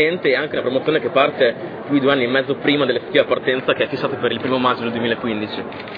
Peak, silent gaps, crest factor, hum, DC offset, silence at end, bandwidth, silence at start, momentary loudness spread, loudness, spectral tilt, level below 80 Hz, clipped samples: -2 dBFS; none; 16 dB; none; under 0.1%; 0 s; 5.2 kHz; 0 s; 5 LU; -19 LUFS; -8 dB/octave; -58 dBFS; under 0.1%